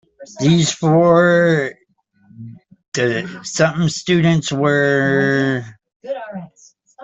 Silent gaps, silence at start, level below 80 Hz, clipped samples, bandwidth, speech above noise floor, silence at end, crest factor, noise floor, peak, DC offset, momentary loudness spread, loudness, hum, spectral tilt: 2.88-2.92 s, 5.96-6.00 s; 0.2 s; -54 dBFS; under 0.1%; 8.2 kHz; 44 dB; 0 s; 14 dB; -59 dBFS; -2 dBFS; under 0.1%; 15 LU; -16 LUFS; none; -5.5 dB/octave